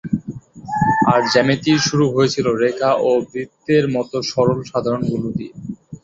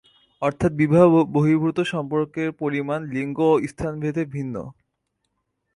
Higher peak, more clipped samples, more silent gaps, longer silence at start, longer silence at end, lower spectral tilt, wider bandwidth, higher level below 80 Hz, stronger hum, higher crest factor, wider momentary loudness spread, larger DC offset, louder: about the same, -2 dBFS vs -4 dBFS; neither; neither; second, 0.05 s vs 0.4 s; second, 0.05 s vs 1.05 s; second, -5.5 dB/octave vs -8 dB/octave; second, 8 kHz vs 11.5 kHz; about the same, -50 dBFS vs -52 dBFS; neither; about the same, 16 dB vs 18 dB; about the same, 13 LU vs 12 LU; neither; first, -18 LUFS vs -22 LUFS